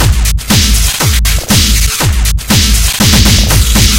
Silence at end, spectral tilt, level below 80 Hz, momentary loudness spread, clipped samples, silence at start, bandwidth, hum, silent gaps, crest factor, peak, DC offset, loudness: 0 s; -3 dB/octave; -12 dBFS; 4 LU; 1%; 0 s; 19.5 kHz; none; none; 8 dB; 0 dBFS; under 0.1%; -8 LUFS